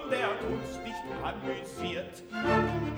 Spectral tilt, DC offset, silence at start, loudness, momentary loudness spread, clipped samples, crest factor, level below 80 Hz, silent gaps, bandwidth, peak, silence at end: -6 dB/octave; under 0.1%; 0 s; -33 LUFS; 11 LU; under 0.1%; 18 dB; -52 dBFS; none; over 20 kHz; -14 dBFS; 0 s